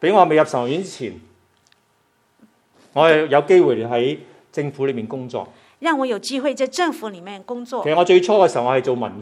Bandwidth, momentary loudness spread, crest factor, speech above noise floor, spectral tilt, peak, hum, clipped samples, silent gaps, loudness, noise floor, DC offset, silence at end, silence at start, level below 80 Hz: 12 kHz; 17 LU; 20 dB; 45 dB; -5.5 dB/octave; 0 dBFS; none; under 0.1%; none; -18 LUFS; -62 dBFS; under 0.1%; 0 s; 0 s; -72 dBFS